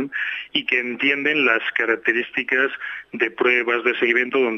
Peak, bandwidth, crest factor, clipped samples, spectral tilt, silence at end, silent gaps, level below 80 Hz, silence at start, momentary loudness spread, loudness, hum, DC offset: -4 dBFS; 6.6 kHz; 18 dB; under 0.1%; -4.5 dB/octave; 0 s; none; -70 dBFS; 0 s; 7 LU; -19 LUFS; none; under 0.1%